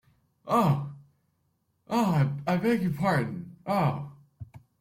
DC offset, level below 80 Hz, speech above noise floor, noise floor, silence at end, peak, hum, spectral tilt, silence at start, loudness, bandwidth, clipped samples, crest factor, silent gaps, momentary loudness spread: under 0.1%; -62 dBFS; 48 dB; -74 dBFS; 0.25 s; -12 dBFS; none; -7.5 dB/octave; 0.45 s; -27 LUFS; 16 kHz; under 0.1%; 16 dB; none; 23 LU